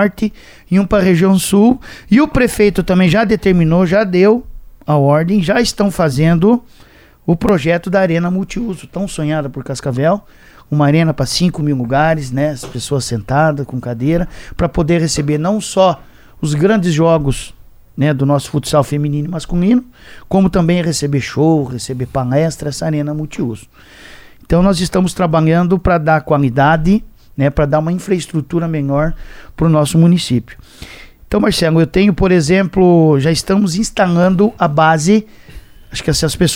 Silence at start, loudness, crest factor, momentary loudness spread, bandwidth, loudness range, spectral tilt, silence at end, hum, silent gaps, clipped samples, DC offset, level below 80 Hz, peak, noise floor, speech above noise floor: 0 s; -14 LUFS; 14 dB; 10 LU; 16.5 kHz; 5 LU; -6 dB/octave; 0 s; none; none; under 0.1%; under 0.1%; -32 dBFS; 0 dBFS; -35 dBFS; 22 dB